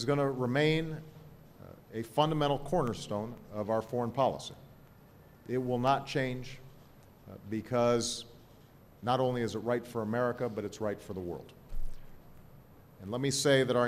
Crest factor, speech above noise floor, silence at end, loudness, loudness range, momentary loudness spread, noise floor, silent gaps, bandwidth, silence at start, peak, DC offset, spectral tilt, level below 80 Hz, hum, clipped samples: 22 dB; 26 dB; 0 s; -32 LUFS; 4 LU; 21 LU; -57 dBFS; none; 15.5 kHz; 0 s; -12 dBFS; under 0.1%; -5 dB/octave; -50 dBFS; none; under 0.1%